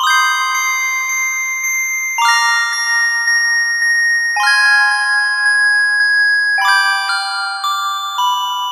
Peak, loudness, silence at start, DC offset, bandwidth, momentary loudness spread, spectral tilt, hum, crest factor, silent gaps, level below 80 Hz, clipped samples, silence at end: -2 dBFS; -13 LUFS; 0 s; under 0.1%; 15.5 kHz; 6 LU; 8.5 dB/octave; none; 14 dB; none; under -90 dBFS; under 0.1%; 0 s